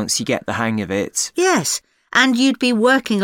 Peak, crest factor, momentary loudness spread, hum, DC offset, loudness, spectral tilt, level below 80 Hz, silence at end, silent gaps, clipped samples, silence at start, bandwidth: -2 dBFS; 16 dB; 7 LU; none; under 0.1%; -17 LUFS; -3 dB/octave; -58 dBFS; 0 s; none; under 0.1%; 0 s; 18.5 kHz